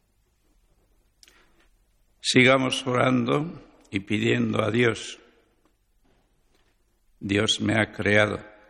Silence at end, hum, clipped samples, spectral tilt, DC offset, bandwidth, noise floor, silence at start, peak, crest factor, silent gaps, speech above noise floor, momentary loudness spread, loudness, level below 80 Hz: 0.2 s; 50 Hz at -60 dBFS; under 0.1%; -4.5 dB/octave; under 0.1%; 11.5 kHz; -67 dBFS; 2.25 s; -6 dBFS; 20 dB; none; 44 dB; 15 LU; -23 LUFS; -56 dBFS